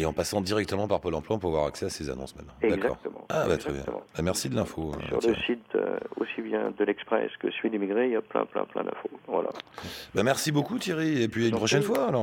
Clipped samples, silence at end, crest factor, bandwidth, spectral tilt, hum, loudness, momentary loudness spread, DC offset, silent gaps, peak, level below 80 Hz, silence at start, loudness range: under 0.1%; 0 s; 18 dB; 17 kHz; -5 dB/octave; none; -29 LUFS; 9 LU; under 0.1%; none; -10 dBFS; -52 dBFS; 0 s; 2 LU